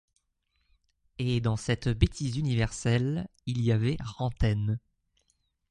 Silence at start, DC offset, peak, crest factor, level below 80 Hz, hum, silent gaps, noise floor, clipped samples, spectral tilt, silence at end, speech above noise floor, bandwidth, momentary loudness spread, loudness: 1.2 s; under 0.1%; -8 dBFS; 22 dB; -42 dBFS; none; none; -76 dBFS; under 0.1%; -6.5 dB/octave; 0.95 s; 48 dB; 11 kHz; 8 LU; -29 LUFS